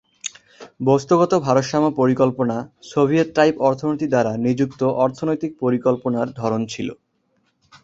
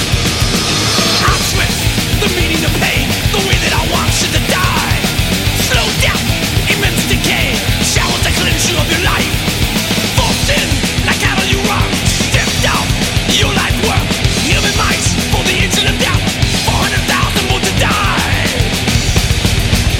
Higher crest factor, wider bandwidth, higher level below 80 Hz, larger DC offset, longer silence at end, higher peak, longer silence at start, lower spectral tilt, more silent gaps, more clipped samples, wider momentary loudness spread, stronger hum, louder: first, 18 dB vs 12 dB; second, 8 kHz vs 17 kHz; second, -58 dBFS vs -22 dBFS; neither; first, 0.9 s vs 0 s; about the same, -2 dBFS vs 0 dBFS; first, 0.25 s vs 0 s; first, -6.5 dB/octave vs -3.5 dB/octave; neither; neither; first, 10 LU vs 2 LU; neither; second, -20 LUFS vs -12 LUFS